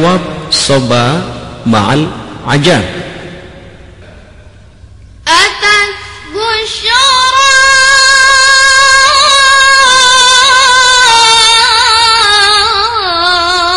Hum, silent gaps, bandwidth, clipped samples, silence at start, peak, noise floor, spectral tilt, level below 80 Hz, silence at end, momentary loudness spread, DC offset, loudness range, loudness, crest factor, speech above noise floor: none; none; 16 kHz; 0.4%; 0 s; 0 dBFS; -35 dBFS; -1.5 dB/octave; -36 dBFS; 0 s; 13 LU; 0.8%; 10 LU; -5 LUFS; 8 dB; 26 dB